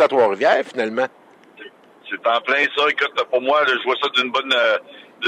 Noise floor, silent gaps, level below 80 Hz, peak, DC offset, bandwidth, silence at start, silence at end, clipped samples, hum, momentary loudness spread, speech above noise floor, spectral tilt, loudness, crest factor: -43 dBFS; none; -78 dBFS; -4 dBFS; under 0.1%; 10.5 kHz; 0 s; 0 s; under 0.1%; none; 7 LU; 24 dB; -3 dB/octave; -18 LUFS; 16 dB